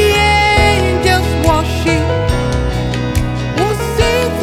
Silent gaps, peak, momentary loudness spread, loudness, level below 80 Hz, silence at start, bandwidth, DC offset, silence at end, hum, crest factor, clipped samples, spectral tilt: none; 0 dBFS; 7 LU; -13 LUFS; -22 dBFS; 0 s; 16.5 kHz; under 0.1%; 0 s; none; 12 dB; under 0.1%; -5 dB/octave